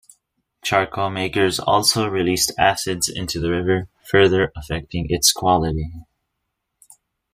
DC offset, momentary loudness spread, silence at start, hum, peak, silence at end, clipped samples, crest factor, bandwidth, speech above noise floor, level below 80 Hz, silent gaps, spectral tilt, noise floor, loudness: under 0.1%; 9 LU; 0.65 s; none; -2 dBFS; 1.3 s; under 0.1%; 20 dB; 15.5 kHz; 58 dB; -42 dBFS; none; -3.5 dB/octave; -77 dBFS; -19 LUFS